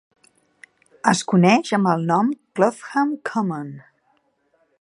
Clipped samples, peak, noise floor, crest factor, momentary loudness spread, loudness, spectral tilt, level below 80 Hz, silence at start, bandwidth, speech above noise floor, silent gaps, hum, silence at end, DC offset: under 0.1%; 0 dBFS; -65 dBFS; 22 dB; 9 LU; -20 LUFS; -5.5 dB/octave; -70 dBFS; 1.05 s; 11.5 kHz; 46 dB; none; none; 1 s; under 0.1%